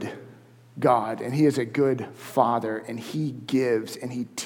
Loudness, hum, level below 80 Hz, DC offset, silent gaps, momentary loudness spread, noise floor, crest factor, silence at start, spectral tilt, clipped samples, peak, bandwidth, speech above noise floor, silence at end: -25 LUFS; none; -74 dBFS; under 0.1%; none; 10 LU; -50 dBFS; 20 dB; 0 s; -6 dB/octave; under 0.1%; -4 dBFS; 19 kHz; 25 dB; 0 s